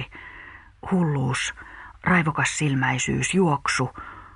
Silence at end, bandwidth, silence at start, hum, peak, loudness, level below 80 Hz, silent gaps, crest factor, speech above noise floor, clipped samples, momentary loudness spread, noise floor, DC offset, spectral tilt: 0.1 s; 11 kHz; 0 s; none; -8 dBFS; -23 LUFS; -50 dBFS; none; 18 dB; 22 dB; under 0.1%; 19 LU; -45 dBFS; under 0.1%; -4.5 dB/octave